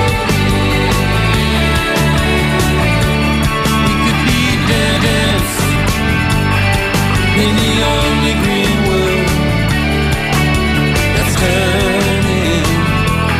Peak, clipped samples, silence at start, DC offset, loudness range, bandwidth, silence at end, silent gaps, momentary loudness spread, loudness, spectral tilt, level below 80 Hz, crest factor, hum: -2 dBFS; under 0.1%; 0 s; under 0.1%; 0 LU; 16 kHz; 0 s; none; 2 LU; -13 LUFS; -5 dB/octave; -22 dBFS; 10 dB; none